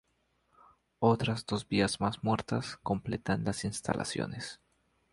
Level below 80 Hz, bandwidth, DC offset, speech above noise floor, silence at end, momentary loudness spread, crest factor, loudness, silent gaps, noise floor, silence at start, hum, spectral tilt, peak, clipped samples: -58 dBFS; 11.5 kHz; under 0.1%; 43 dB; 0.6 s; 8 LU; 22 dB; -32 LUFS; none; -75 dBFS; 1 s; none; -5.5 dB/octave; -12 dBFS; under 0.1%